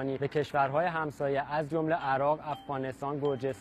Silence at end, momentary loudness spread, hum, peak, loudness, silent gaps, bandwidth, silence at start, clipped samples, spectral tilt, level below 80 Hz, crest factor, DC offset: 0 s; 7 LU; none; -16 dBFS; -31 LUFS; none; 13.5 kHz; 0 s; under 0.1%; -7 dB/octave; -64 dBFS; 16 dB; under 0.1%